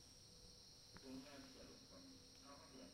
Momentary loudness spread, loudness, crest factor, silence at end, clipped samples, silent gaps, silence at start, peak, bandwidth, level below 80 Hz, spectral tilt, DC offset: 5 LU; -60 LUFS; 20 dB; 0 s; under 0.1%; none; 0 s; -42 dBFS; 16 kHz; -74 dBFS; -3.5 dB/octave; under 0.1%